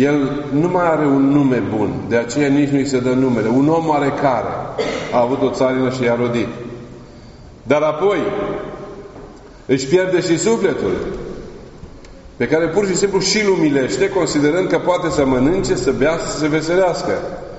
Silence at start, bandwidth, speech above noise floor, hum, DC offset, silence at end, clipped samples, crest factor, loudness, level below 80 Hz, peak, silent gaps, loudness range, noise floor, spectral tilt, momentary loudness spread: 0 s; 8 kHz; 22 dB; none; under 0.1%; 0 s; under 0.1%; 16 dB; -17 LUFS; -40 dBFS; -2 dBFS; none; 4 LU; -38 dBFS; -5 dB/octave; 14 LU